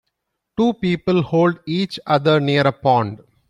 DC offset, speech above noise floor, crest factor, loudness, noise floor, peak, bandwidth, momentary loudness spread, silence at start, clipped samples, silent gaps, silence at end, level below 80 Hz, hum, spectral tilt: under 0.1%; 58 dB; 16 dB; -18 LUFS; -76 dBFS; -2 dBFS; 11 kHz; 7 LU; 0.6 s; under 0.1%; none; 0.35 s; -54 dBFS; none; -7.5 dB/octave